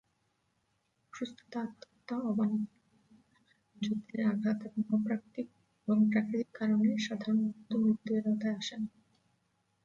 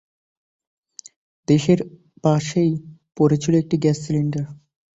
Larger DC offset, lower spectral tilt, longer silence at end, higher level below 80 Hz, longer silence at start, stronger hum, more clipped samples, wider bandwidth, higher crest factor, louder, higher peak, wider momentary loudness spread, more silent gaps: neither; about the same, -6.5 dB/octave vs -7 dB/octave; first, 0.95 s vs 0.4 s; second, -76 dBFS vs -56 dBFS; second, 1.15 s vs 1.5 s; neither; neither; about the same, 7.4 kHz vs 8 kHz; about the same, 16 dB vs 18 dB; second, -33 LUFS vs -20 LUFS; second, -18 dBFS vs -4 dBFS; about the same, 14 LU vs 13 LU; neither